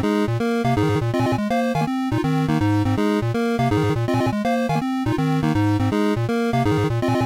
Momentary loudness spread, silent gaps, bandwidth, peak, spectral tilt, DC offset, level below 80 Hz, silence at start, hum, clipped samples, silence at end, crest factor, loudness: 2 LU; none; 16 kHz; -12 dBFS; -7 dB/octave; 0.1%; -44 dBFS; 0 s; none; under 0.1%; 0 s; 8 dB; -21 LUFS